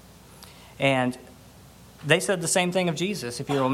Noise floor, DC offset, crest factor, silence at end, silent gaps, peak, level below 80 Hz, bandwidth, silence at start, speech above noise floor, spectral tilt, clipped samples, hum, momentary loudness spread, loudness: -49 dBFS; under 0.1%; 22 dB; 0 s; none; -4 dBFS; -58 dBFS; 16.5 kHz; 0.3 s; 25 dB; -4 dB/octave; under 0.1%; none; 18 LU; -24 LUFS